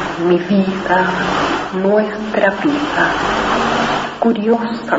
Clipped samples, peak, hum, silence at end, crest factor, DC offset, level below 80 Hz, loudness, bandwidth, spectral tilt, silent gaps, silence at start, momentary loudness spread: under 0.1%; 0 dBFS; none; 0 s; 16 dB; 0.1%; -42 dBFS; -15 LUFS; 8 kHz; -5.5 dB/octave; none; 0 s; 3 LU